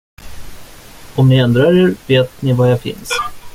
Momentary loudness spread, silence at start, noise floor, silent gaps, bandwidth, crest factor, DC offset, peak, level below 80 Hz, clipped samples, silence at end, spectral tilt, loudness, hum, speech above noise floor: 9 LU; 0.2 s; -36 dBFS; none; 15.5 kHz; 14 dB; under 0.1%; -2 dBFS; -40 dBFS; under 0.1%; 0.05 s; -6.5 dB/octave; -13 LUFS; none; 23 dB